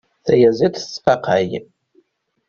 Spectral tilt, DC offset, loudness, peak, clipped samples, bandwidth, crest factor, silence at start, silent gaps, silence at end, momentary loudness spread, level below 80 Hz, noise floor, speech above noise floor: -6 dB/octave; under 0.1%; -17 LUFS; 0 dBFS; under 0.1%; 7.2 kHz; 18 dB; 0.25 s; none; 0.85 s; 9 LU; -54 dBFS; -60 dBFS; 44 dB